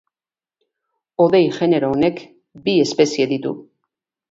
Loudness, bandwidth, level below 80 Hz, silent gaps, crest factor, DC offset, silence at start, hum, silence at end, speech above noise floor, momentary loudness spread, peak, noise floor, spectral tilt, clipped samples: -18 LUFS; 7.8 kHz; -60 dBFS; none; 18 dB; under 0.1%; 1.2 s; none; 0.7 s; over 73 dB; 15 LU; -2 dBFS; under -90 dBFS; -5.5 dB/octave; under 0.1%